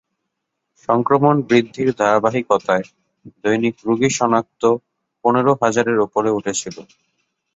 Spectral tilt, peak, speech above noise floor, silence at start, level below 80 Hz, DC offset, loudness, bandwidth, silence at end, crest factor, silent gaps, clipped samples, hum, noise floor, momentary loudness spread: -5 dB/octave; -2 dBFS; 59 dB; 0.9 s; -58 dBFS; under 0.1%; -18 LUFS; 8 kHz; 0.75 s; 18 dB; none; under 0.1%; none; -77 dBFS; 9 LU